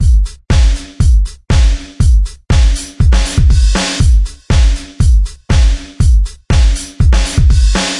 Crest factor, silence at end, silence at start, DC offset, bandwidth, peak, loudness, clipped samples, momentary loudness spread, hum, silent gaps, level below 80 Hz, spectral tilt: 10 dB; 0 s; 0 s; under 0.1%; 11.5 kHz; 0 dBFS; -13 LUFS; under 0.1%; 4 LU; none; none; -10 dBFS; -5 dB/octave